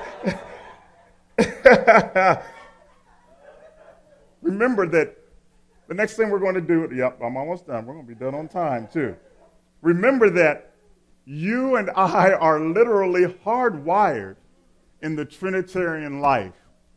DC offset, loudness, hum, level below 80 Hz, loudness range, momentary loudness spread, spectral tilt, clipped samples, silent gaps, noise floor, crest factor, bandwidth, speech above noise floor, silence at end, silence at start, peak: under 0.1%; -21 LUFS; none; -54 dBFS; 6 LU; 15 LU; -6.5 dB/octave; under 0.1%; none; -57 dBFS; 22 dB; 11 kHz; 37 dB; 0.45 s; 0 s; 0 dBFS